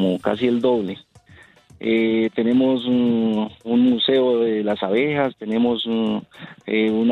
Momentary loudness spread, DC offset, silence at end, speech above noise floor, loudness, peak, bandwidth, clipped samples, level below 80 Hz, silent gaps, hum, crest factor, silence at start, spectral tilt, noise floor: 7 LU; under 0.1%; 0 s; 30 dB; -20 LUFS; -6 dBFS; 4.5 kHz; under 0.1%; -62 dBFS; none; none; 14 dB; 0 s; -7.5 dB/octave; -49 dBFS